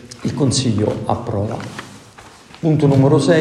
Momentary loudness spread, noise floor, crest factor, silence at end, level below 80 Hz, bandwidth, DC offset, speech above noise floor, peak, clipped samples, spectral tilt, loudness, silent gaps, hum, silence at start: 17 LU; -42 dBFS; 16 dB; 0 s; -50 dBFS; 11.5 kHz; under 0.1%; 26 dB; 0 dBFS; under 0.1%; -6 dB/octave; -17 LUFS; none; none; 0.05 s